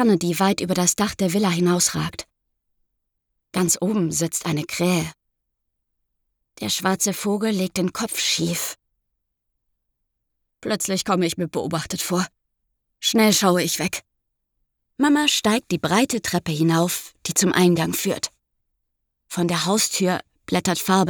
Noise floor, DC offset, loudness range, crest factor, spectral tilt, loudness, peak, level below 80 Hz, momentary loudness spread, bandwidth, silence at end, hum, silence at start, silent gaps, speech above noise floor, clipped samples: -77 dBFS; under 0.1%; 5 LU; 20 dB; -4 dB/octave; -21 LUFS; -4 dBFS; -58 dBFS; 10 LU; over 20 kHz; 0 s; none; 0 s; none; 56 dB; under 0.1%